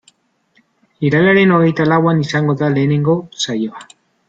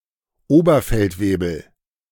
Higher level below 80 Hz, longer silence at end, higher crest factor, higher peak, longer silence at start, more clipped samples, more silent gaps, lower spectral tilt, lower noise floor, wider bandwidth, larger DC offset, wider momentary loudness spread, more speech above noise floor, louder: second, -54 dBFS vs -34 dBFS; about the same, 0.45 s vs 0.5 s; about the same, 14 dB vs 16 dB; about the same, -2 dBFS vs -2 dBFS; first, 1 s vs 0.5 s; neither; neither; about the same, -6.5 dB/octave vs -7 dB/octave; about the same, -59 dBFS vs -57 dBFS; second, 8 kHz vs 18 kHz; neither; about the same, 10 LU vs 11 LU; first, 45 dB vs 40 dB; first, -14 LUFS vs -18 LUFS